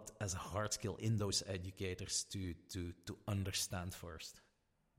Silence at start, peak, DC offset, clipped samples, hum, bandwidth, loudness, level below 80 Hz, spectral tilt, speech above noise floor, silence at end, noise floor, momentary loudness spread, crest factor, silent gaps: 0 s; -24 dBFS; under 0.1%; under 0.1%; none; 16 kHz; -42 LUFS; -66 dBFS; -4 dB/octave; 37 dB; 0.6 s; -79 dBFS; 11 LU; 20 dB; none